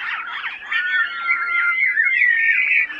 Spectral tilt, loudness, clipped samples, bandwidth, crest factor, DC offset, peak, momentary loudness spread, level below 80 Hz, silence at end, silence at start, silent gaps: 0 dB/octave; -17 LUFS; under 0.1%; 8.4 kHz; 14 dB; under 0.1%; -6 dBFS; 11 LU; -68 dBFS; 0 s; 0 s; none